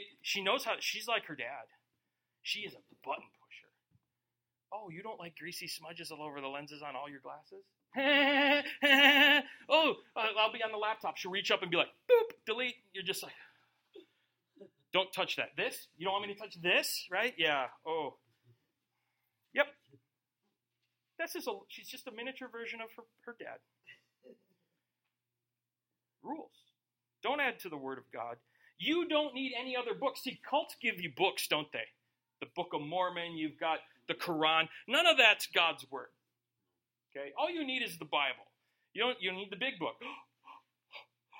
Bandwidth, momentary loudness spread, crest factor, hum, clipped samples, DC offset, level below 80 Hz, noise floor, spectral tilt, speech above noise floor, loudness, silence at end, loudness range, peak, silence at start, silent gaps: 16.5 kHz; 19 LU; 26 dB; none; under 0.1%; under 0.1%; -88 dBFS; under -90 dBFS; -2.5 dB/octave; over 56 dB; -32 LUFS; 0 s; 18 LU; -10 dBFS; 0 s; none